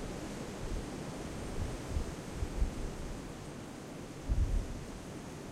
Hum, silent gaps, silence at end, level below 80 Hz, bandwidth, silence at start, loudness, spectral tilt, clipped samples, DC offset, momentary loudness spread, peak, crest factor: none; none; 0 s; -40 dBFS; 15 kHz; 0 s; -41 LUFS; -5.5 dB/octave; under 0.1%; under 0.1%; 9 LU; -20 dBFS; 18 dB